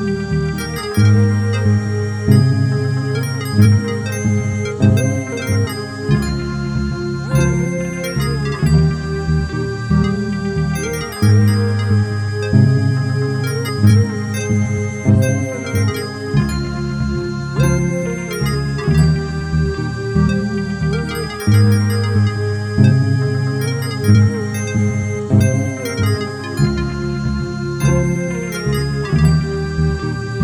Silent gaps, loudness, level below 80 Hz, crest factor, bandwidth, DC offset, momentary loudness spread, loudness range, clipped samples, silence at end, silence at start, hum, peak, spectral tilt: none; -17 LUFS; -30 dBFS; 14 dB; 15.5 kHz; under 0.1%; 8 LU; 3 LU; under 0.1%; 0 s; 0 s; none; 0 dBFS; -6.5 dB/octave